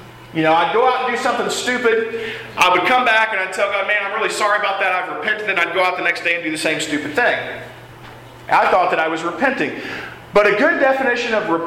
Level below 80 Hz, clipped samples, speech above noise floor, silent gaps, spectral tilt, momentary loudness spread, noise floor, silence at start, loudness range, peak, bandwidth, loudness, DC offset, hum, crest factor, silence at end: -54 dBFS; under 0.1%; 21 dB; none; -3 dB/octave; 9 LU; -38 dBFS; 0 s; 3 LU; -2 dBFS; 16.5 kHz; -17 LUFS; under 0.1%; none; 16 dB; 0 s